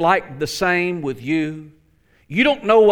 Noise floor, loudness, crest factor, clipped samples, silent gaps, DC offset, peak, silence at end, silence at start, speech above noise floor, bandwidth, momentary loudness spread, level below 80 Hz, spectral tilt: -58 dBFS; -19 LUFS; 16 dB; under 0.1%; none; under 0.1%; -2 dBFS; 0 s; 0 s; 40 dB; 18 kHz; 11 LU; -50 dBFS; -5 dB/octave